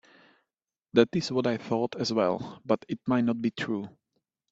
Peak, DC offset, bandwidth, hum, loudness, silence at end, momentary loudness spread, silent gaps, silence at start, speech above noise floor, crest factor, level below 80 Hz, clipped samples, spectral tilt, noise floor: -6 dBFS; under 0.1%; 8 kHz; none; -28 LUFS; 0.65 s; 8 LU; none; 0.95 s; 60 dB; 24 dB; -68 dBFS; under 0.1%; -6 dB/octave; -88 dBFS